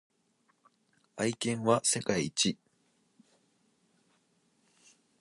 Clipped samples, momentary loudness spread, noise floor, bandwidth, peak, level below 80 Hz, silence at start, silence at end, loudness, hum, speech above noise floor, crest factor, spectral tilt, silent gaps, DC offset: under 0.1%; 11 LU; -73 dBFS; 11.5 kHz; -12 dBFS; -70 dBFS; 1.15 s; 2.65 s; -30 LUFS; none; 43 dB; 24 dB; -3.5 dB/octave; none; under 0.1%